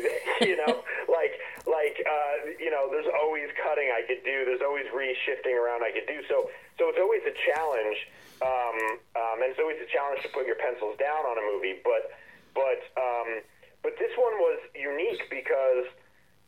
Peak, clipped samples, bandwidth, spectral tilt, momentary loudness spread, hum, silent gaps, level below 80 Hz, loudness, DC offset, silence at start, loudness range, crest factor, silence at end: -8 dBFS; under 0.1%; 14.5 kHz; -3.5 dB/octave; 7 LU; none; none; -72 dBFS; -29 LUFS; under 0.1%; 0 s; 2 LU; 20 dB; 0.55 s